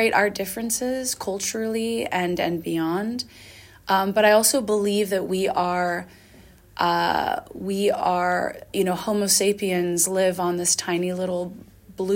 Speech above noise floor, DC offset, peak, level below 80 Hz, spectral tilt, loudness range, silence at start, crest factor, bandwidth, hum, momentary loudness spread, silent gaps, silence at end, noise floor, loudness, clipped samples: 27 dB; under 0.1%; -6 dBFS; -58 dBFS; -3 dB/octave; 3 LU; 0 s; 18 dB; 17 kHz; none; 10 LU; none; 0 s; -50 dBFS; -23 LUFS; under 0.1%